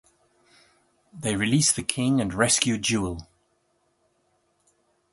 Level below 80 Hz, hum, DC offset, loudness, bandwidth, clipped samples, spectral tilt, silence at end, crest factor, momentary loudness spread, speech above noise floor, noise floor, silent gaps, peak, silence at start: -52 dBFS; none; under 0.1%; -23 LUFS; 12 kHz; under 0.1%; -3.5 dB/octave; 1.9 s; 24 dB; 11 LU; 46 dB; -70 dBFS; none; -4 dBFS; 1.15 s